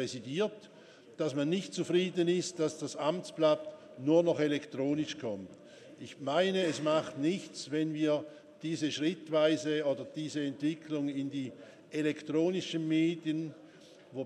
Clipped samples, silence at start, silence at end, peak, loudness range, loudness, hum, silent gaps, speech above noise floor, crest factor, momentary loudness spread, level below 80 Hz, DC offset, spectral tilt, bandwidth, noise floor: under 0.1%; 0 s; 0 s; -14 dBFS; 3 LU; -33 LUFS; none; none; 23 dB; 18 dB; 12 LU; -84 dBFS; under 0.1%; -5.5 dB/octave; 11 kHz; -56 dBFS